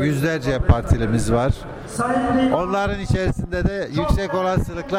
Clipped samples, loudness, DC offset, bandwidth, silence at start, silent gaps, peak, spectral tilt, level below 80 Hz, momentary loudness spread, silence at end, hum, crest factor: under 0.1%; -21 LUFS; under 0.1%; 15.5 kHz; 0 s; none; -4 dBFS; -6.5 dB/octave; -28 dBFS; 5 LU; 0 s; none; 16 dB